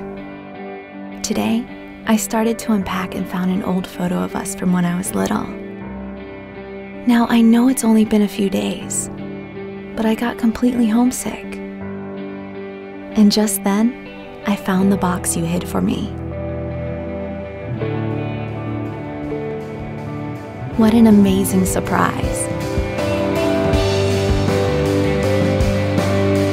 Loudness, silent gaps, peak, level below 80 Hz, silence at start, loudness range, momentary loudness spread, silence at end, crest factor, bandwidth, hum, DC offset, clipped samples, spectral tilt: -18 LUFS; none; -2 dBFS; -36 dBFS; 0 s; 7 LU; 16 LU; 0 s; 16 dB; 16 kHz; none; under 0.1%; under 0.1%; -5.5 dB/octave